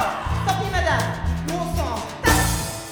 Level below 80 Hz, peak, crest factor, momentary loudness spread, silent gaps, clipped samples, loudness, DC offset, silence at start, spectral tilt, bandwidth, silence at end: -30 dBFS; -2 dBFS; 20 dB; 7 LU; none; under 0.1%; -22 LUFS; under 0.1%; 0 s; -4 dB/octave; over 20 kHz; 0 s